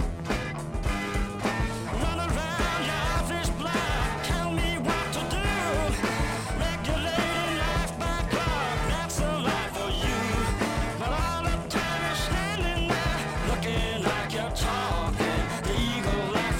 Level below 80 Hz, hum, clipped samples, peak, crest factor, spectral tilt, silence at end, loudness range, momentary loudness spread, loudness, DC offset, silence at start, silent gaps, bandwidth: -34 dBFS; none; under 0.1%; -12 dBFS; 14 dB; -4.5 dB/octave; 0 s; 1 LU; 3 LU; -28 LUFS; under 0.1%; 0 s; none; 16.5 kHz